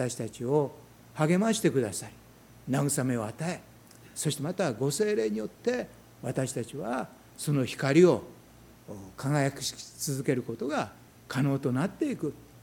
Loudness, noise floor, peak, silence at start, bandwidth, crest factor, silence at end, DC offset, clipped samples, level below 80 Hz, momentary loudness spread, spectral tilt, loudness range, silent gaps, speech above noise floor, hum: -29 LUFS; -54 dBFS; -8 dBFS; 0 s; 18 kHz; 20 dB; 0.05 s; under 0.1%; under 0.1%; -64 dBFS; 15 LU; -5.5 dB/octave; 3 LU; none; 25 dB; none